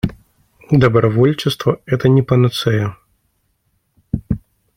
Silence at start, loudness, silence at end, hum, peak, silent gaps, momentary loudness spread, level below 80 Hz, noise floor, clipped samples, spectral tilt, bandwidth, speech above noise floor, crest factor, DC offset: 0.05 s; -16 LUFS; 0.4 s; none; -2 dBFS; none; 12 LU; -40 dBFS; -65 dBFS; under 0.1%; -7 dB/octave; 15.5 kHz; 51 dB; 16 dB; under 0.1%